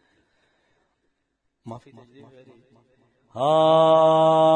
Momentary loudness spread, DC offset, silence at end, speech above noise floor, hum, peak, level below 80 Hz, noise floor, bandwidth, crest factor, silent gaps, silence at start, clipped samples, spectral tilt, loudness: 25 LU; under 0.1%; 0 s; 55 dB; none; -6 dBFS; -74 dBFS; -75 dBFS; 9 kHz; 16 dB; none; 1.65 s; under 0.1%; -6.5 dB/octave; -17 LUFS